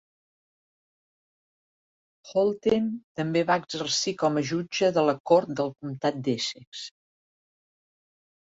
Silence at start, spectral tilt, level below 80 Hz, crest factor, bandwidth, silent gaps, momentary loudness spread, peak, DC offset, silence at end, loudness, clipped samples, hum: 2.25 s; -4.5 dB/octave; -68 dBFS; 20 dB; 8 kHz; 3.04-3.15 s, 5.20-5.25 s, 6.67-6.72 s; 9 LU; -8 dBFS; under 0.1%; 1.65 s; -26 LUFS; under 0.1%; none